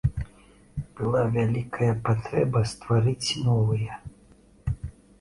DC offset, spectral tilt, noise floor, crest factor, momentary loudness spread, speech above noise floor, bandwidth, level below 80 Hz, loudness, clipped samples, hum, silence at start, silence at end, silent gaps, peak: under 0.1%; -6.5 dB/octave; -55 dBFS; 16 dB; 14 LU; 31 dB; 11.5 kHz; -44 dBFS; -26 LUFS; under 0.1%; none; 0.05 s; 0.3 s; none; -10 dBFS